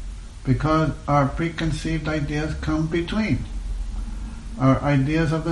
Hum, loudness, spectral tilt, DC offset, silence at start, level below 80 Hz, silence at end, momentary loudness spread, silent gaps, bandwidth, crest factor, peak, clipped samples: none; -23 LUFS; -7 dB/octave; under 0.1%; 0 s; -32 dBFS; 0 s; 13 LU; none; 11.5 kHz; 16 dB; -6 dBFS; under 0.1%